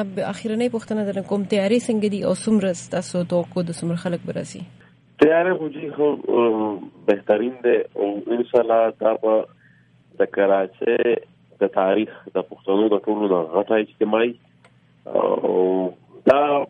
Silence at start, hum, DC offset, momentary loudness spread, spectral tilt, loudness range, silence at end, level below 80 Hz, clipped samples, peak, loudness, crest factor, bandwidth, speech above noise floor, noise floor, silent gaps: 0 s; none; under 0.1%; 8 LU; -6 dB/octave; 2 LU; 0.05 s; -66 dBFS; under 0.1%; -4 dBFS; -21 LUFS; 18 dB; 11 kHz; 34 dB; -55 dBFS; none